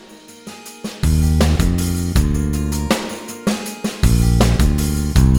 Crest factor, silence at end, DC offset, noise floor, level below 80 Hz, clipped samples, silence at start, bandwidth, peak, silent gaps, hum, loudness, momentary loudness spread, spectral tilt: 14 dB; 0 s; under 0.1%; -38 dBFS; -20 dBFS; under 0.1%; 0.1 s; 17.5 kHz; -2 dBFS; none; none; -18 LUFS; 16 LU; -5.5 dB/octave